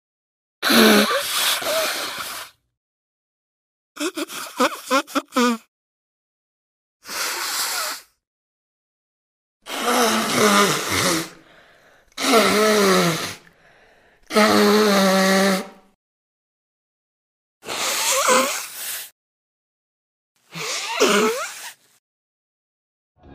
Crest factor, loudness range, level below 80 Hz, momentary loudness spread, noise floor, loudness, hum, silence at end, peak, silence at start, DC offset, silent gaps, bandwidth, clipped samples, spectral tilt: 22 dB; 8 LU; -64 dBFS; 16 LU; -54 dBFS; -19 LUFS; none; 0 s; 0 dBFS; 0.6 s; under 0.1%; 2.77-3.95 s, 5.68-7.00 s, 8.27-9.60 s, 15.95-17.61 s, 19.12-20.35 s, 21.99-23.15 s; 15.5 kHz; under 0.1%; -3 dB/octave